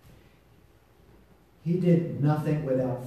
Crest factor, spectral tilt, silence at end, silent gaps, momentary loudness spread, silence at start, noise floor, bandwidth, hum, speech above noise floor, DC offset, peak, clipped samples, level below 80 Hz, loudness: 18 dB; -9.5 dB/octave; 0 s; none; 6 LU; 1.65 s; -59 dBFS; 8.6 kHz; none; 33 dB; under 0.1%; -12 dBFS; under 0.1%; -60 dBFS; -26 LUFS